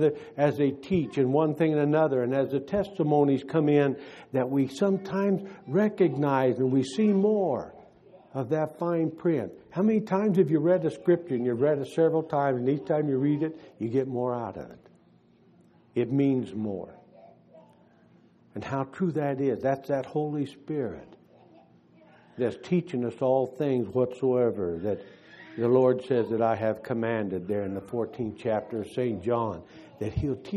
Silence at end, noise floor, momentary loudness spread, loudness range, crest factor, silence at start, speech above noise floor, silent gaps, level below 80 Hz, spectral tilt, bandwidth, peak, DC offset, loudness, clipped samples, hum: 0 s; -60 dBFS; 10 LU; 7 LU; 18 dB; 0 s; 34 dB; none; -58 dBFS; -8.5 dB/octave; 12.5 kHz; -10 dBFS; under 0.1%; -27 LUFS; under 0.1%; none